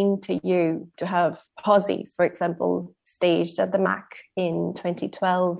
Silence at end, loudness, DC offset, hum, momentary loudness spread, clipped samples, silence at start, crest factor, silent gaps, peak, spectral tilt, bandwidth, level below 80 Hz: 0 s; -25 LUFS; under 0.1%; none; 9 LU; under 0.1%; 0 s; 18 dB; none; -6 dBFS; -10.5 dB/octave; 4 kHz; -70 dBFS